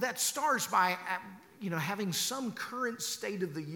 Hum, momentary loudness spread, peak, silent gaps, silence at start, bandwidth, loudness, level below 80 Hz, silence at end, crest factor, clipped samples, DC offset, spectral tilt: none; 9 LU; -16 dBFS; none; 0 s; 19 kHz; -33 LUFS; -82 dBFS; 0 s; 18 dB; under 0.1%; under 0.1%; -2.5 dB/octave